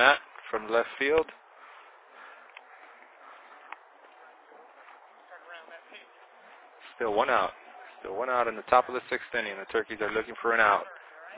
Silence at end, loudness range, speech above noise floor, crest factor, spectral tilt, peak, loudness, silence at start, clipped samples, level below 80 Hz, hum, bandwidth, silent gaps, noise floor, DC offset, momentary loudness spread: 0 s; 22 LU; 27 dB; 26 dB; 0 dB/octave; -6 dBFS; -28 LUFS; 0 s; under 0.1%; -66 dBFS; none; 4 kHz; none; -54 dBFS; under 0.1%; 26 LU